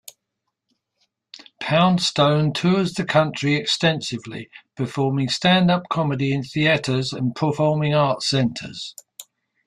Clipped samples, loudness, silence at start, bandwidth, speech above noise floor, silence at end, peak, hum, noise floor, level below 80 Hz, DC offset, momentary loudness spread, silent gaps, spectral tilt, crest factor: under 0.1%; -20 LUFS; 1.6 s; 14 kHz; 59 dB; 0.45 s; -4 dBFS; none; -79 dBFS; -58 dBFS; under 0.1%; 14 LU; none; -5.5 dB/octave; 18 dB